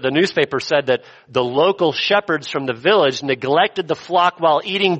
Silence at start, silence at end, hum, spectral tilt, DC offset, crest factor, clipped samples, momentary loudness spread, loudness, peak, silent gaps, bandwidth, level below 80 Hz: 0 s; 0 s; none; -4.5 dB/octave; under 0.1%; 16 dB; under 0.1%; 6 LU; -18 LUFS; 0 dBFS; none; 8.4 kHz; -62 dBFS